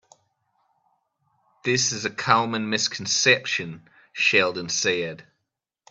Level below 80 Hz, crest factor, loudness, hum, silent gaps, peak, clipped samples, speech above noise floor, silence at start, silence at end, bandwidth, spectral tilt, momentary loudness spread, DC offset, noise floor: -68 dBFS; 24 dB; -22 LUFS; none; none; -2 dBFS; under 0.1%; 58 dB; 1.65 s; 0.7 s; 8.8 kHz; -2 dB/octave; 11 LU; under 0.1%; -81 dBFS